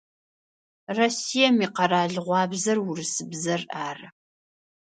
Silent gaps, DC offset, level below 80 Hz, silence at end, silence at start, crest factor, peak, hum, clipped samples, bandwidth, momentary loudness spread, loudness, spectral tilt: none; under 0.1%; -74 dBFS; 0.75 s; 0.9 s; 20 dB; -6 dBFS; none; under 0.1%; 9.4 kHz; 12 LU; -24 LUFS; -3.5 dB/octave